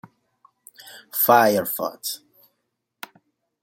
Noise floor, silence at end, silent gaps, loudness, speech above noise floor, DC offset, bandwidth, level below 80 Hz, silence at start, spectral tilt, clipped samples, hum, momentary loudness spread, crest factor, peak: -77 dBFS; 1.45 s; none; -20 LUFS; 57 dB; under 0.1%; 17 kHz; -72 dBFS; 0.85 s; -3.5 dB/octave; under 0.1%; none; 26 LU; 22 dB; -2 dBFS